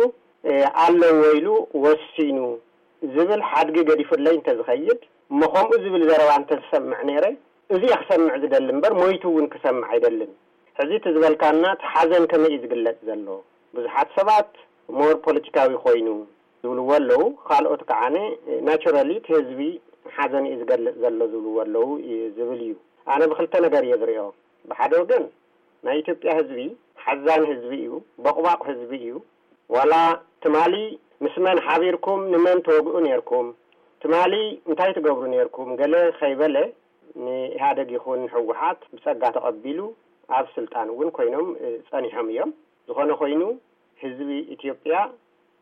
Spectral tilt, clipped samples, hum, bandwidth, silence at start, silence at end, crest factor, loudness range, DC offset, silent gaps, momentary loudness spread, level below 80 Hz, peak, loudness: -6 dB/octave; under 0.1%; none; 7.6 kHz; 0 s; 0.5 s; 12 dB; 6 LU; under 0.1%; none; 13 LU; -70 dBFS; -8 dBFS; -21 LUFS